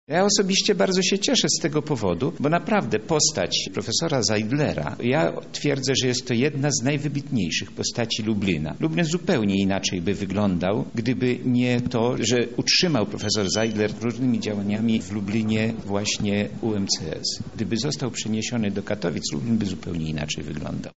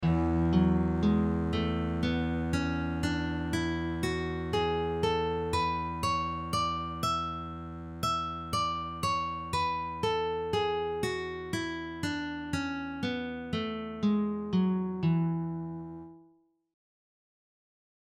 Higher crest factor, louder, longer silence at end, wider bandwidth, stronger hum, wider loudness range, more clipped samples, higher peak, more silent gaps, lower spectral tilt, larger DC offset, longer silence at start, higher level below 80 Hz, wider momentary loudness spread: about the same, 16 dB vs 16 dB; first, -23 LUFS vs -31 LUFS; second, 0.05 s vs 1.8 s; second, 8 kHz vs 15 kHz; neither; about the same, 4 LU vs 3 LU; neither; first, -8 dBFS vs -14 dBFS; neither; second, -4.5 dB/octave vs -6 dB/octave; first, 0.6% vs under 0.1%; about the same, 0.05 s vs 0 s; second, -52 dBFS vs -46 dBFS; about the same, 7 LU vs 8 LU